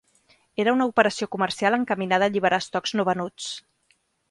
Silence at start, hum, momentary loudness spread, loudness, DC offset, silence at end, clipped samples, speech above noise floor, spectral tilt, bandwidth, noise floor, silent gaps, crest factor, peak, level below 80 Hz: 0.6 s; none; 12 LU; -23 LUFS; under 0.1%; 0.7 s; under 0.1%; 44 dB; -4.5 dB/octave; 11.5 kHz; -67 dBFS; none; 20 dB; -4 dBFS; -66 dBFS